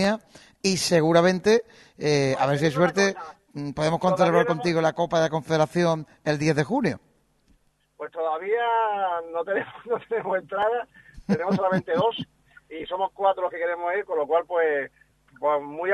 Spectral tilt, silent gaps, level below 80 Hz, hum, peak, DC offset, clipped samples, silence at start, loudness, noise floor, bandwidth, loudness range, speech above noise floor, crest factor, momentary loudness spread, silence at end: -5 dB/octave; none; -60 dBFS; none; -4 dBFS; under 0.1%; under 0.1%; 0 s; -24 LUFS; -63 dBFS; 12.5 kHz; 4 LU; 40 dB; 20 dB; 12 LU; 0 s